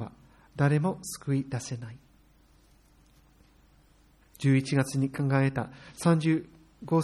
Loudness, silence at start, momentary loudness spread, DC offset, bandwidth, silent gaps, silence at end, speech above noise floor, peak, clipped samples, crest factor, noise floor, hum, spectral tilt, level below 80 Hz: -28 LUFS; 0 s; 15 LU; under 0.1%; 13 kHz; none; 0 s; 34 dB; -10 dBFS; under 0.1%; 20 dB; -61 dBFS; none; -6.5 dB/octave; -62 dBFS